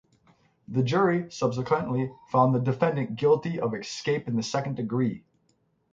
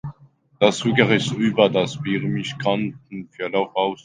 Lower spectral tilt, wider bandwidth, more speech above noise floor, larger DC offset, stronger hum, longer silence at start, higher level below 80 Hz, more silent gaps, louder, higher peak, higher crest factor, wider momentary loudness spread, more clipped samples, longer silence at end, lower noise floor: about the same, -6.5 dB/octave vs -5.5 dB/octave; second, 7.8 kHz vs 9.8 kHz; first, 44 dB vs 29 dB; neither; neither; first, 0.7 s vs 0.05 s; about the same, -64 dBFS vs -60 dBFS; neither; second, -27 LUFS vs -21 LUFS; second, -8 dBFS vs 0 dBFS; about the same, 18 dB vs 22 dB; second, 7 LU vs 12 LU; neither; first, 0.75 s vs 0.1 s; first, -70 dBFS vs -50 dBFS